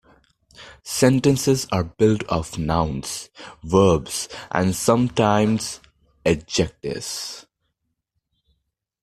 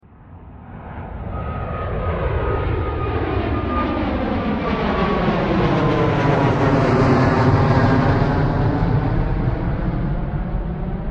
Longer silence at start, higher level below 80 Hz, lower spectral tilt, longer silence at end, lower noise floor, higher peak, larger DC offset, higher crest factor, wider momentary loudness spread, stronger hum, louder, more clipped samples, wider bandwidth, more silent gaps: first, 0.6 s vs 0.2 s; second, -46 dBFS vs -28 dBFS; second, -5 dB/octave vs -8.5 dB/octave; first, 1.6 s vs 0 s; first, -76 dBFS vs -41 dBFS; about the same, -2 dBFS vs -2 dBFS; neither; about the same, 20 dB vs 16 dB; first, 14 LU vs 11 LU; neither; about the same, -21 LUFS vs -19 LUFS; neither; first, 14.5 kHz vs 7.8 kHz; neither